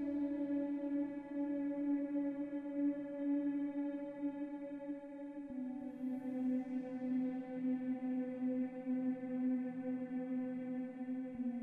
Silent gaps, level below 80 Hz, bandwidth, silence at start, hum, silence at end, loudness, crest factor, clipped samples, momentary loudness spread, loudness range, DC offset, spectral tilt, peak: none; -78 dBFS; 3.9 kHz; 0 s; none; 0 s; -41 LUFS; 10 dB; under 0.1%; 7 LU; 3 LU; under 0.1%; -9 dB/octave; -30 dBFS